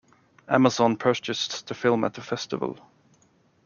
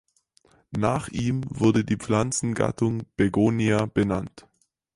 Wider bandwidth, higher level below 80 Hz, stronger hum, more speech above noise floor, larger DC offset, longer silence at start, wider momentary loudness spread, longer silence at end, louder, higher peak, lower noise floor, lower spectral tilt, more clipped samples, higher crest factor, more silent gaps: second, 7.2 kHz vs 11.5 kHz; second, -68 dBFS vs -50 dBFS; neither; about the same, 38 dB vs 39 dB; neither; second, 0.5 s vs 0.7 s; first, 11 LU vs 6 LU; first, 0.9 s vs 0.55 s; about the same, -25 LUFS vs -24 LUFS; first, -4 dBFS vs -8 dBFS; about the same, -63 dBFS vs -63 dBFS; about the same, -5 dB/octave vs -6 dB/octave; neither; about the same, 22 dB vs 18 dB; neither